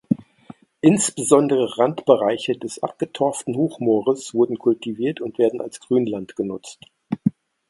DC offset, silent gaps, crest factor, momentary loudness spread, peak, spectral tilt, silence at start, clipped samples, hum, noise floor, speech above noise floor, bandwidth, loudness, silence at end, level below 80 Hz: under 0.1%; none; 20 dB; 11 LU; 0 dBFS; -5.5 dB/octave; 0.1 s; under 0.1%; none; -46 dBFS; 25 dB; 11.5 kHz; -21 LUFS; 0.4 s; -64 dBFS